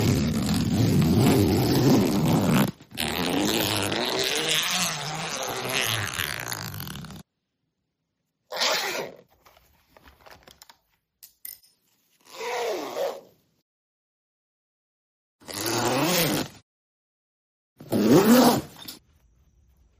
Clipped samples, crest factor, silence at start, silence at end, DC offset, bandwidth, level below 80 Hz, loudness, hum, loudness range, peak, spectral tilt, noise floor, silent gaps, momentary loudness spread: under 0.1%; 22 dB; 0 s; 1.05 s; under 0.1%; 15.5 kHz; -50 dBFS; -23 LUFS; none; 13 LU; -4 dBFS; -4.5 dB/octave; -79 dBFS; 13.62-15.39 s, 16.62-17.76 s; 17 LU